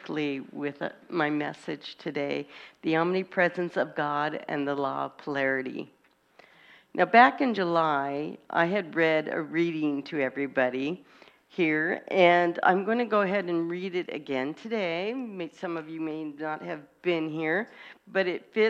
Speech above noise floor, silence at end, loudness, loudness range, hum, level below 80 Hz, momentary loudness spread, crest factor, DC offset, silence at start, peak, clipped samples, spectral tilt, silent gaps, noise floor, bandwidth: 32 dB; 0 s; -28 LUFS; 7 LU; none; -76 dBFS; 13 LU; 24 dB; under 0.1%; 0 s; -4 dBFS; under 0.1%; -6.5 dB/octave; none; -59 dBFS; 8.4 kHz